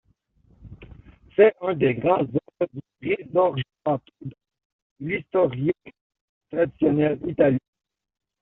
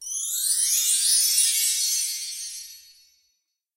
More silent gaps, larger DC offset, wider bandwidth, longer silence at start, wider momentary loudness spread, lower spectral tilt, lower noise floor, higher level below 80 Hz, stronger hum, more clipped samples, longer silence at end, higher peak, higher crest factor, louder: first, 4.65-4.96 s, 6.01-6.10 s, 6.21-6.41 s vs none; neither; second, 4 kHz vs 16 kHz; first, 0.65 s vs 0 s; about the same, 14 LU vs 15 LU; first, -6.5 dB/octave vs 8 dB/octave; second, -62 dBFS vs -74 dBFS; first, -58 dBFS vs -74 dBFS; neither; neither; about the same, 0.85 s vs 0.95 s; first, -4 dBFS vs -8 dBFS; about the same, 20 dB vs 18 dB; second, -23 LUFS vs -20 LUFS